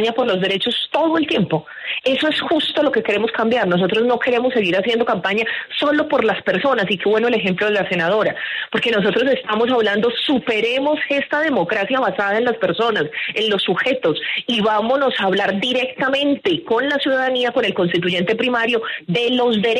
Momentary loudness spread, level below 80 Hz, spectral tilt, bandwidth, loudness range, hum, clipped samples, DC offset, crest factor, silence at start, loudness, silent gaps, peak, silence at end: 3 LU; -60 dBFS; -5.5 dB/octave; 11.5 kHz; 1 LU; none; under 0.1%; under 0.1%; 14 dB; 0 s; -18 LUFS; none; -4 dBFS; 0 s